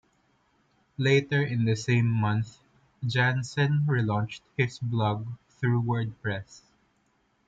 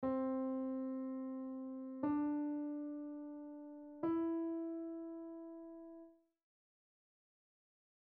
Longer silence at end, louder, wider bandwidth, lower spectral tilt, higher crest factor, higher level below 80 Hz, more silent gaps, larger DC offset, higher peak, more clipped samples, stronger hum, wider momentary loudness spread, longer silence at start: second, 0.9 s vs 2 s; first, -27 LUFS vs -43 LUFS; first, 7.8 kHz vs 3.4 kHz; second, -6.5 dB/octave vs -8 dB/octave; about the same, 16 dB vs 16 dB; first, -62 dBFS vs -78 dBFS; neither; neither; first, -12 dBFS vs -26 dBFS; neither; neither; second, 10 LU vs 14 LU; first, 1 s vs 0 s